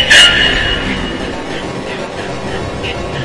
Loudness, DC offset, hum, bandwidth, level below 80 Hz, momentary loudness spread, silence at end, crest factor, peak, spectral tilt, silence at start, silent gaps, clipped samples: -13 LUFS; under 0.1%; none; 12 kHz; -28 dBFS; 16 LU; 0 s; 14 dB; 0 dBFS; -2.5 dB/octave; 0 s; none; 0.6%